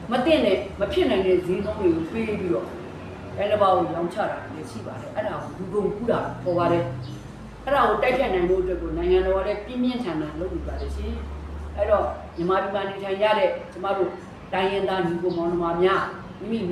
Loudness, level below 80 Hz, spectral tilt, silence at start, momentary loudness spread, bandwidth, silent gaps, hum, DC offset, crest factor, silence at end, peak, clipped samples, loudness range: -24 LUFS; -40 dBFS; -7 dB/octave; 0 s; 14 LU; 12 kHz; none; none; under 0.1%; 18 dB; 0 s; -6 dBFS; under 0.1%; 3 LU